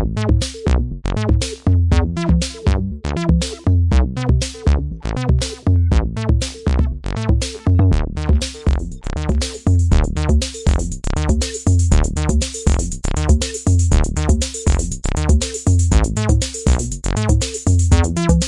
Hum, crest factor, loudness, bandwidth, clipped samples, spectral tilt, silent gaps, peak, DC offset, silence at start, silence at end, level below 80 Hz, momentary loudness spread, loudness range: none; 12 dB; -18 LUFS; 11.5 kHz; under 0.1%; -5.5 dB/octave; none; -2 dBFS; under 0.1%; 0 s; 0 s; -20 dBFS; 6 LU; 2 LU